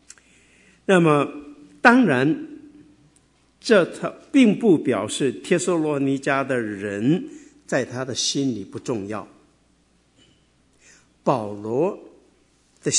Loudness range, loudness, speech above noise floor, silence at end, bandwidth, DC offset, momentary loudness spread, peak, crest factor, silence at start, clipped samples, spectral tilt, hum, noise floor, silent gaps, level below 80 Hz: 9 LU; -21 LUFS; 41 dB; 0 s; 11 kHz; under 0.1%; 15 LU; 0 dBFS; 22 dB; 0.9 s; under 0.1%; -4.5 dB/octave; none; -61 dBFS; none; -66 dBFS